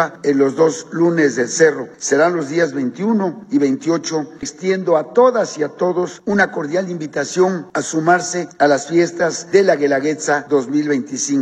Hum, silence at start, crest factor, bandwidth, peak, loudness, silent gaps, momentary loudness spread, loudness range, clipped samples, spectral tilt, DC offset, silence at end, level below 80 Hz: none; 0 s; 16 dB; 9.8 kHz; 0 dBFS; -17 LUFS; none; 7 LU; 2 LU; under 0.1%; -4.5 dB/octave; under 0.1%; 0 s; -64 dBFS